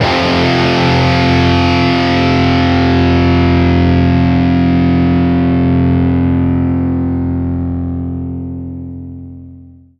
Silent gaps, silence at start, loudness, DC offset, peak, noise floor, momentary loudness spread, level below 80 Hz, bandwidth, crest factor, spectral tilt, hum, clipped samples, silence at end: none; 0 s; -12 LUFS; under 0.1%; 0 dBFS; -37 dBFS; 12 LU; -32 dBFS; 7 kHz; 12 dB; -7.5 dB/octave; none; under 0.1%; 0.35 s